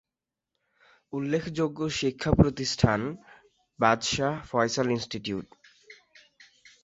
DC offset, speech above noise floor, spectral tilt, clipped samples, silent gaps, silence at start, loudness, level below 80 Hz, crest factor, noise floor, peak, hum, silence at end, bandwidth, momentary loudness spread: under 0.1%; 62 dB; -5 dB/octave; under 0.1%; none; 1.15 s; -27 LUFS; -46 dBFS; 24 dB; -89 dBFS; -6 dBFS; none; 0.9 s; 8 kHz; 12 LU